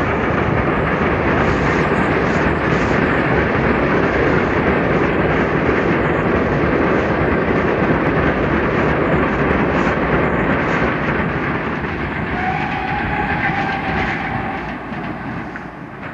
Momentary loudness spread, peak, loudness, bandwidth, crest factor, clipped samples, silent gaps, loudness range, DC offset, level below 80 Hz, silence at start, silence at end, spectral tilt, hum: 6 LU; -2 dBFS; -17 LUFS; 8.4 kHz; 14 dB; under 0.1%; none; 4 LU; under 0.1%; -30 dBFS; 0 s; 0 s; -7.5 dB/octave; none